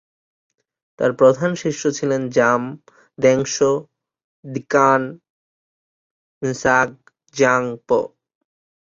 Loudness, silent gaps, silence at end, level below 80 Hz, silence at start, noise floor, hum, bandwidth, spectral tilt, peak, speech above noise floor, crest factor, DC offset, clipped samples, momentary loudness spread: -18 LUFS; 4.24-4.43 s, 5.30-6.41 s; 0.75 s; -58 dBFS; 1 s; under -90 dBFS; none; 7.6 kHz; -5 dB/octave; -2 dBFS; over 72 dB; 18 dB; under 0.1%; under 0.1%; 14 LU